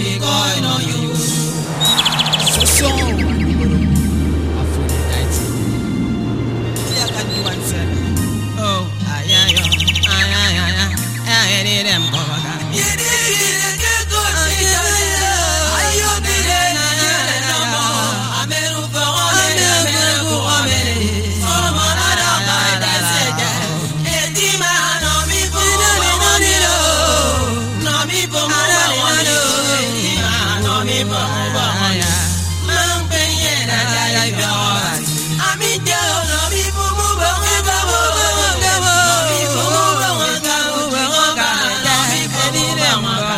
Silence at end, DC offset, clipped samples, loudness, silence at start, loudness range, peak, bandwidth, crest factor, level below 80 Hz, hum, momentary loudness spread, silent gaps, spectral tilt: 0 s; under 0.1%; under 0.1%; -14 LUFS; 0 s; 3 LU; 0 dBFS; 16 kHz; 16 dB; -30 dBFS; none; 7 LU; none; -2.5 dB/octave